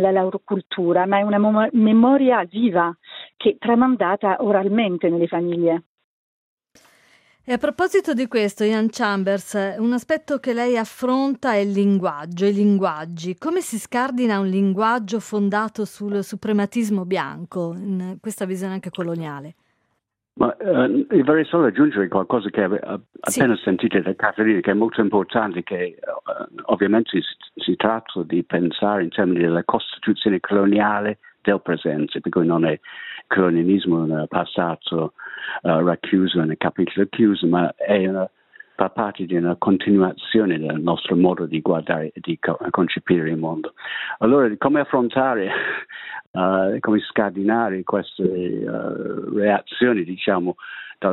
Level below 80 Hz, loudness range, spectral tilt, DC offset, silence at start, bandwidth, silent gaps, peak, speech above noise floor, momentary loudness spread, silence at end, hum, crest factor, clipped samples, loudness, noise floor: -64 dBFS; 4 LU; -6 dB/octave; under 0.1%; 0 s; 15 kHz; 0.66-0.70 s, 5.86-5.98 s, 6.04-6.57 s, 46.27-46.34 s; 0 dBFS; 54 dB; 10 LU; 0 s; none; 20 dB; under 0.1%; -20 LUFS; -74 dBFS